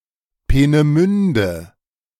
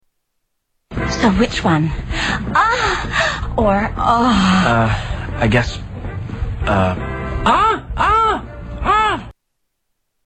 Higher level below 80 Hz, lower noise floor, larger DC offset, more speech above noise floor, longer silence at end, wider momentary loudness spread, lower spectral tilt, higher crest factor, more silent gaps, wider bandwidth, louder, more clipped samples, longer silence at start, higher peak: about the same, -28 dBFS vs -28 dBFS; second, -35 dBFS vs -71 dBFS; neither; second, 20 dB vs 56 dB; second, 0.55 s vs 0.95 s; second, 9 LU vs 12 LU; first, -7.5 dB/octave vs -5.5 dB/octave; about the same, 14 dB vs 16 dB; neither; first, 13.5 kHz vs 8.8 kHz; about the same, -16 LUFS vs -16 LUFS; neither; second, 0.5 s vs 0.9 s; about the same, -2 dBFS vs -2 dBFS